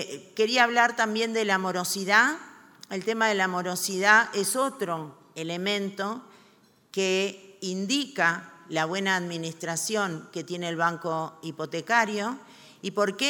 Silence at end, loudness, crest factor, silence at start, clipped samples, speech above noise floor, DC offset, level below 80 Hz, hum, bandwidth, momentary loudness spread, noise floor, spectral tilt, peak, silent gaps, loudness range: 0 s; -26 LUFS; 22 dB; 0 s; under 0.1%; 33 dB; under 0.1%; -82 dBFS; none; 19 kHz; 15 LU; -60 dBFS; -3 dB/octave; -4 dBFS; none; 5 LU